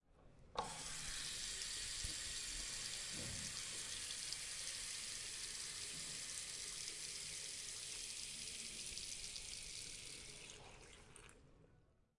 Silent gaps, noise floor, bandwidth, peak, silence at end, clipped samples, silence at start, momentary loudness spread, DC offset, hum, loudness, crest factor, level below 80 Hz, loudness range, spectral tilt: none; -72 dBFS; 11.5 kHz; -26 dBFS; 0.3 s; under 0.1%; 0.1 s; 8 LU; under 0.1%; none; -45 LUFS; 22 dB; -64 dBFS; 5 LU; 0 dB/octave